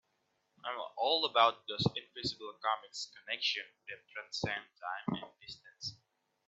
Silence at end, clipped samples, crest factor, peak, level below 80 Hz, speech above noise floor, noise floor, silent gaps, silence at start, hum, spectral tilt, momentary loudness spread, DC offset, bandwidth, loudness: 0.55 s; under 0.1%; 26 dB; -12 dBFS; -72 dBFS; 43 dB; -79 dBFS; none; 0.65 s; none; -4 dB/octave; 17 LU; under 0.1%; 8.2 kHz; -35 LUFS